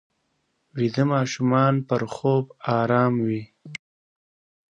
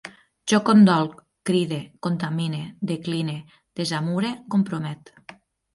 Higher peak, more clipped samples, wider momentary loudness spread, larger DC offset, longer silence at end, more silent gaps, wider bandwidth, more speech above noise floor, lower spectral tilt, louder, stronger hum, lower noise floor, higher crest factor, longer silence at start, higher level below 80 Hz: about the same, -6 dBFS vs -6 dBFS; neither; about the same, 18 LU vs 17 LU; neither; first, 0.95 s vs 0.4 s; neither; second, 8.8 kHz vs 11.5 kHz; first, 50 dB vs 26 dB; about the same, -7 dB/octave vs -6 dB/octave; about the same, -23 LUFS vs -23 LUFS; neither; first, -72 dBFS vs -48 dBFS; about the same, 18 dB vs 18 dB; first, 0.75 s vs 0.05 s; about the same, -66 dBFS vs -66 dBFS